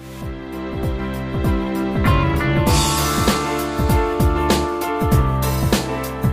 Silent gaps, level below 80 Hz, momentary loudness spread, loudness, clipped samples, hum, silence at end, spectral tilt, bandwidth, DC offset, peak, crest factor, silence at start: none; -26 dBFS; 9 LU; -19 LUFS; under 0.1%; none; 0 s; -5.5 dB/octave; 15.5 kHz; under 0.1%; -4 dBFS; 14 dB; 0 s